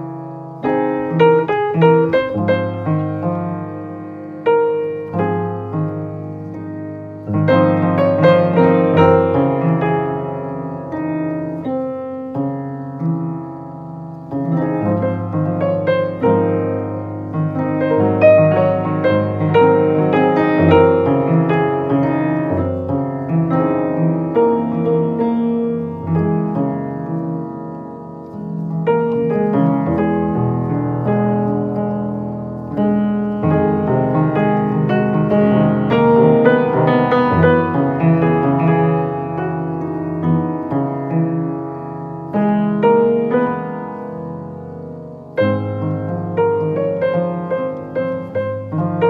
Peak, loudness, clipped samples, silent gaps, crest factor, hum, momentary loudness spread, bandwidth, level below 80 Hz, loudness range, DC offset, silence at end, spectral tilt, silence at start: 0 dBFS; -17 LUFS; under 0.1%; none; 16 dB; none; 14 LU; 4.8 kHz; -54 dBFS; 7 LU; under 0.1%; 0 s; -10.5 dB/octave; 0 s